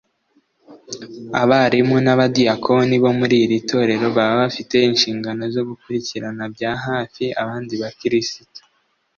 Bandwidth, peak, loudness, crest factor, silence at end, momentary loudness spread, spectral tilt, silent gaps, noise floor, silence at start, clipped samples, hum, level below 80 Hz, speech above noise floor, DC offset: 7.2 kHz; -2 dBFS; -18 LUFS; 16 dB; 0.6 s; 12 LU; -5.5 dB/octave; none; -65 dBFS; 0.7 s; under 0.1%; none; -58 dBFS; 47 dB; under 0.1%